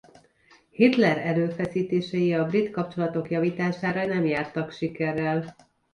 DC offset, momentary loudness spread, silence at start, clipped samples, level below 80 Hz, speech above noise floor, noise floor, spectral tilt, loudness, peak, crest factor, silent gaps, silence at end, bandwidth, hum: under 0.1%; 8 LU; 0.8 s; under 0.1%; -64 dBFS; 34 dB; -59 dBFS; -8 dB/octave; -25 LUFS; -6 dBFS; 20 dB; none; 0.4 s; 10.5 kHz; none